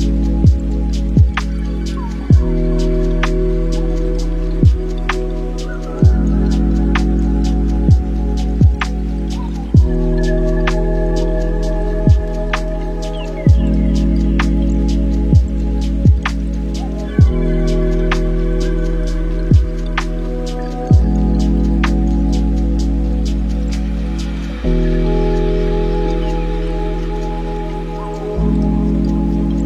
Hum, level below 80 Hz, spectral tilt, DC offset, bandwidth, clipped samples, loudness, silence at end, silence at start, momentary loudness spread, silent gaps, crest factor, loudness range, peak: none; -16 dBFS; -8 dB/octave; 0.3%; 8.4 kHz; under 0.1%; -17 LUFS; 0 s; 0 s; 8 LU; none; 14 dB; 3 LU; 0 dBFS